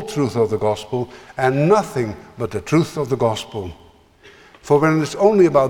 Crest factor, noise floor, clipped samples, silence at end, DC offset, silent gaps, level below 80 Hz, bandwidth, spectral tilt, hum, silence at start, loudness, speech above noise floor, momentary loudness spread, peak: 16 dB; -48 dBFS; under 0.1%; 0 s; under 0.1%; none; -50 dBFS; 16.5 kHz; -6.5 dB/octave; none; 0 s; -19 LUFS; 30 dB; 13 LU; -2 dBFS